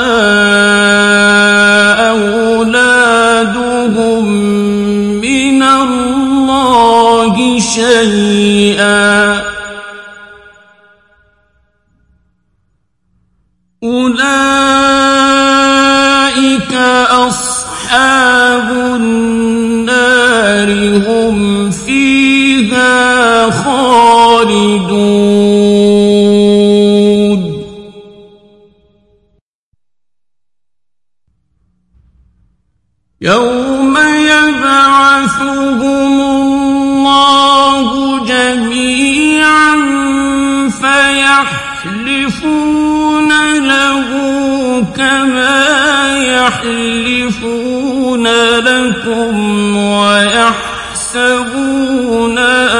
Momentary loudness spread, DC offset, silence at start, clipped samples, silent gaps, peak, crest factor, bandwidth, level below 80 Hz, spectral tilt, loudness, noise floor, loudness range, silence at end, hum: 7 LU; under 0.1%; 0 s; 0.1%; 29.41-29.72 s; 0 dBFS; 10 dB; 11.5 kHz; -40 dBFS; -3.5 dB/octave; -9 LUFS; -85 dBFS; 5 LU; 0 s; none